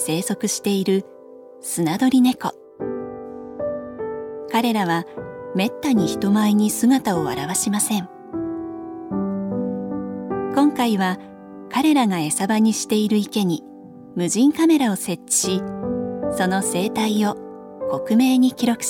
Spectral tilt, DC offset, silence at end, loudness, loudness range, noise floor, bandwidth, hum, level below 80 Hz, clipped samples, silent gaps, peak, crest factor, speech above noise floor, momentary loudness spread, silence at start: -4.5 dB/octave; under 0.1%; 0 s; -21 LUFS; 4 LU; -42 dBFS; 18 kHz; none; -58 dBFS; under 0.1%; none; -4 dBFS; 16 dB; 23 dB; 14 LU; 0 s